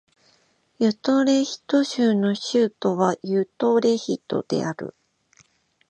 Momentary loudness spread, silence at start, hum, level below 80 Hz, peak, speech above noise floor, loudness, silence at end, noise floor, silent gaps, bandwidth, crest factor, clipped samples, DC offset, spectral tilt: 7 LU; 0.8 s; none; -70 dBFS; -6 dBFS; 42 dB; -22 LUFS; 1 s; -63 dBFS; none; 9 kHz; 18 dB; under 0.1%; under 0.1%; -5.5 dB/octave